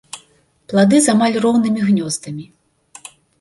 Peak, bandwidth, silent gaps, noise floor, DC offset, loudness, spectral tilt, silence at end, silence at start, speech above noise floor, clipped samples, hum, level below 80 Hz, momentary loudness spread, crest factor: -2 dBFS; 11.5 kHz; none; -55 dBFS; under 0.1%; -15 LUFS; -5 dB/octave; 0.95 s; 0.15 s; 40 dB; under 0.1%; none; -58 dBFS; 24 LU; 14 dB